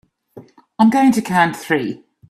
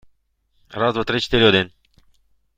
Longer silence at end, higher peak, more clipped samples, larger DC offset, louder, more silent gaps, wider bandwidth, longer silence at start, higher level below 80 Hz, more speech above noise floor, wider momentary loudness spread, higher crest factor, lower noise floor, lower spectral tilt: second, 0.35 s vs 0.9 s; about the same, -2 dBFS vs -2 dBFS; neither; neither; about the same, -16 LUFS vs -18 LUFS; neither; first, 14 kHz vs 9.4 kHz; second, 0.35 s vs 0.7 s; second, -60 dBFS vs -44 dBFS; second, 28 dB vs 47 dB; second, 8 LU vs 14 LU; about the same, 16 dB vs 20 dB; second, -43 dBFS vs -65 dBFS; about the same, -5.5 dB/octave vs -5.5 dB/octave